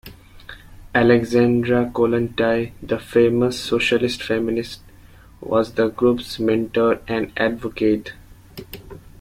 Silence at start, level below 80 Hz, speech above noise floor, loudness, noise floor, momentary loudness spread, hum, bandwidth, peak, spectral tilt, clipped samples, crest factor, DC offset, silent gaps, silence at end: 0.05 s; -46 dBFS; 26 dB; -20 LUFS; -45 dBFS; 21 LU; none; 16 kHz; -2 dBFS; -6 dB/octave; under 0.1%; 18 dB; under 0.1%; none; 0.1 s